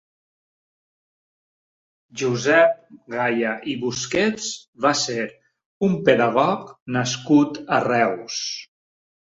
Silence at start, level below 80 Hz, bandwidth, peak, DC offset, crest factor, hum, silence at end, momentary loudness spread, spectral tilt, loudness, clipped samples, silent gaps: 2.15 s; -62 dBFS; 7.8 kHz; -2 dBFS; under 0.1%; 20 dB; none; 0.75 s; 12 LU; -4.5 dB/octave; -21 LUFS; under 0.1%; 4.68-4.73 s, 5.66-5.81 s, 6.82-6.86 s